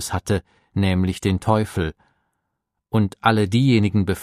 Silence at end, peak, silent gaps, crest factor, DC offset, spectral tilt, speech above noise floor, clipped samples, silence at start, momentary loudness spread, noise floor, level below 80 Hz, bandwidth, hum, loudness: 0 s; 0 dBFS; none; 20 dB; under 0.1%; -6.5 dB/octave; 59 dB; under 0.1%; 0 s; 8 LU; -78 dBFS; -44 dBFS; 14.5 kHz; none; -21 LUFS